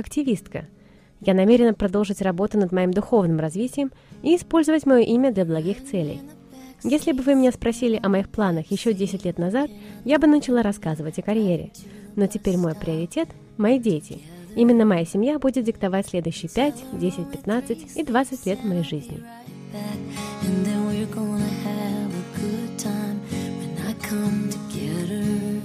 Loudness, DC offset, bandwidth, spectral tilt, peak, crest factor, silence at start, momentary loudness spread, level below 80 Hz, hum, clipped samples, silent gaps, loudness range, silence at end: -23 LUFS; under 0.1%; 15.5 kHz; -6.5 dB/octave; -4 dBFS; 18 dB; 0 s; 13 LU; -50 dBFS; none; under 0.1%; none; 6 LU; 0 s